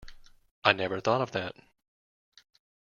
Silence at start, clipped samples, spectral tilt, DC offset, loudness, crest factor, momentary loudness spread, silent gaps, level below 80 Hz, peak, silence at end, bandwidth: 0 s; under 0.1%; -5 dB/octave; under 0.1%; -29 LUFS; 28 dB; 10 LU; 0.51-0.62 s; -60 dBFS; -4 dBFS; 1.3 s; 7.2 kHz